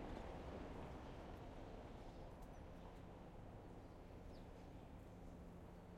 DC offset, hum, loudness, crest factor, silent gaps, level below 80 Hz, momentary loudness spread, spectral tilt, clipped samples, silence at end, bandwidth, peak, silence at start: under 0.1%; none; -57 LUFS; 18 dB; none; -60 dBFS; 6 LU; -7 dB/octave; under 0.1%; 0 s; 16 kHz; -38 dBFS; 0 s